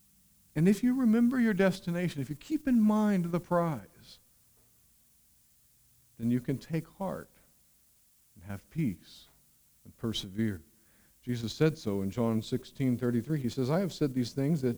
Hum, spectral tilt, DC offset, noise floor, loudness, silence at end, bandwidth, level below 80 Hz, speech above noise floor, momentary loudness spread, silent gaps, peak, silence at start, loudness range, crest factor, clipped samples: none; -7 dB/octave; under 0.1%; -66 dBFS; -31 LUFS; 0 s; over 20 kHz; -62 dBFS; 36 dB; 13 LU; none; -14 dBFS; 0.55 s; 11 LU; 18 dB; under 0.1%